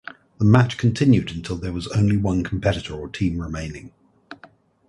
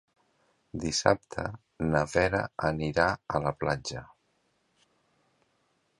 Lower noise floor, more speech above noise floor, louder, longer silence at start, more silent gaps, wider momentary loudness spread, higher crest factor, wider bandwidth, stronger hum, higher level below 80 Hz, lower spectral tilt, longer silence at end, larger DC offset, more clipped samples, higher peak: second, -51 dBFS vs -73 dBFS; second, 31 dB vs 44 dB; first, -21 LUFS vs -29 LUFS; second, 0.4 s vs 0.75 s; neither; first, 15 LU vs 12 LU; second, 20 dB vs 28 dB; about the same, 11.5 kHz vs 11.5 kHz; neither; first, -40 dBFS vs -50 dBFS; first, -7 dB/octave vs -4.5 dB/octave; second, 0.55 s vs 1.95 s; neither; neither; first, 0 dBFS vs -4 dBFS